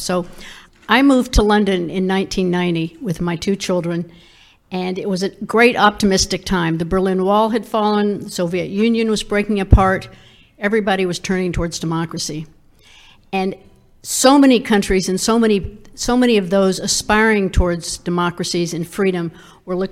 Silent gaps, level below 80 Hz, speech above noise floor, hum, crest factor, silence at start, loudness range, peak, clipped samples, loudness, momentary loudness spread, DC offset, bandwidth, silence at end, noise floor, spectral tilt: none; -30 dBFS; 30 dB; none; 18 dB; 0 s; 6 LU; 0 dBFS; under 0.1%; -17 LUFS; 11 LU; under 0.1%; 16 kHz; 0 s; -47 dBFS; -4.5 dB/octave